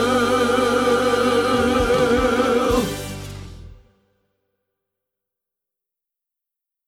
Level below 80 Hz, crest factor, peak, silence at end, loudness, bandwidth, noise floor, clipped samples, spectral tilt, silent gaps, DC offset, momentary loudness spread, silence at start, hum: -40 dBFS; 16 dB; -4 dBFS; 3.15 s; -18 LUFS; 16.5 kHz; -83 dBFS; under 0.1%; -4.5 dB/octave; none; under 0.1%; 13 LU; 0 s; none